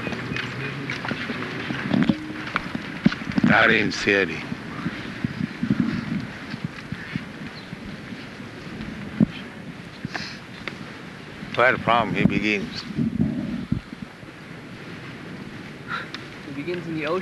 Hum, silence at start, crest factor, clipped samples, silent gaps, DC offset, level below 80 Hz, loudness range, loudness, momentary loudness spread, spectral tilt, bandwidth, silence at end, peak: none; 0 s; 24 dB; under 0.1%; none; under 0.1%; -50 dBFS; 10 LU; -25 LUFS; 17 LU; -6 dB/octave; 12 kHz; 0 s; -2 dBFS